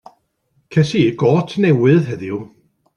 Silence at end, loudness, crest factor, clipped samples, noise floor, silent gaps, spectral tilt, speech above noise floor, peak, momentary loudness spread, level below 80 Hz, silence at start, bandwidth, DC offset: 0.5 s; -16 LUFS; 14 dB; under 0.1%; -64 dBFS; none; -7.5 dB/octave; 49 dB; -2 dBFS; 12 LU; -54 dBFS; 0.7 s; 10.5 kHz; under 0.1%